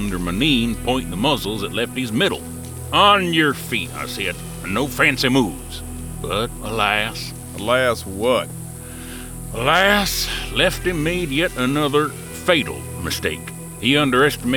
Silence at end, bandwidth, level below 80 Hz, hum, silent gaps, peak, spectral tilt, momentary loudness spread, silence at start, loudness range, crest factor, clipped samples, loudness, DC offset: 0 s; 19.5 kHz; -36 dBFS; none; none; -2 dBFS; -4 dB/octave; 15 LU; 0 s; 3 LU; 18 dB; under 0.1%; -19 LUFS; under 0.1%